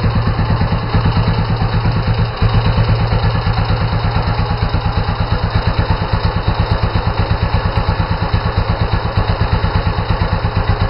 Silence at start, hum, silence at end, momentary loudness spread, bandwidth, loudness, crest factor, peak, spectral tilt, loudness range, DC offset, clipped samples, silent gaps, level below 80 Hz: 0 s; none; 0 s; 3 LU; 5.8 kHz; -16 LUFS; 12 dB; -2 dBFS; -10 dB/octave; 1 LU; under 0.1%; under 0.1%; none; -20 dBFS